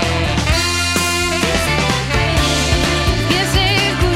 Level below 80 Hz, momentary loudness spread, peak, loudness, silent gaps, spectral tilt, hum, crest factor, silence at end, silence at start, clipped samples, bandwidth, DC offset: -24 dBFS; 2 LU; -2 dBFS; -15 LUFS; none; -3.5 dB/octave; none; 14 dB; 0 s; 0 s; under 0.1%; 16.5 kHz; under 0.1%